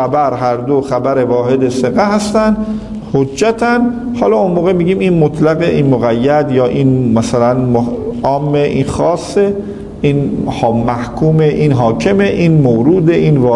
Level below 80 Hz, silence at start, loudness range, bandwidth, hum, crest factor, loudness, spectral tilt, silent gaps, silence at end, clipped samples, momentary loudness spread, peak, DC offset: -36 dBFS; 0 s; 2 LU; 11.5 kHz; none; 12 dB; -12 LUFS; -7.5 dB/octave; none; 0 s; under 0.1%; 5 LU; 0 dBFS; under 0.1%